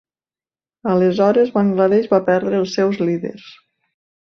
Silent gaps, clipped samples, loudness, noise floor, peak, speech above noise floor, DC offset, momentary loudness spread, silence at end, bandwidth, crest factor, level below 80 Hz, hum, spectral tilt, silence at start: none; under 0.1%; -17 LUFS; under -90 dBFS; -2 dBFS; over 74 dB; under 0.1%; 8 LU; 0.8 s; 6.6 kHz; 16 dB; -62 dBFS; none; -7 dB/octave; 0.85 s